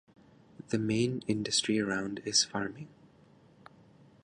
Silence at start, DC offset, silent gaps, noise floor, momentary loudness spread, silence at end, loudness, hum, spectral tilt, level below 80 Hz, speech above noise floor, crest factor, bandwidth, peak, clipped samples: 0.7 s; under 0.1%; none; -61 dBFS; 11 LU; 1.35 s; -31 LUFS; none; -3.5 dB/octave; -66 dBFS; 29 dB; 20 dB; 11.5 kHz; -14 dBFS; under 0.1%